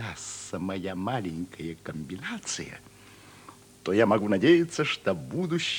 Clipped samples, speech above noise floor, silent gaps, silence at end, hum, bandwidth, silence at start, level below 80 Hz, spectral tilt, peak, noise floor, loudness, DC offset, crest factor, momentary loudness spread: under 0.1%; 24 dB; none; 0 s; none; 18 kHz; 0 s; -64 dBFS; -5 dB/octave; -8 dBFS; -51 dBFS; -28 LUFS; under 0.1%; 20 dB; 16 LU